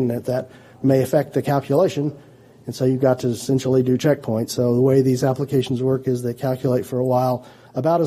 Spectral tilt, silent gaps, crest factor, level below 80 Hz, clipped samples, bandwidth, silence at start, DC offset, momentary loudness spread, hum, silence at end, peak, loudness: -7 dB/octave; none; 16 dB; -58 dBFS; under 0.1%; 15.5 kHz; 0 s; under 0.1%; 9 LU; none; 0 s; -4 dBFS; -20 LUFS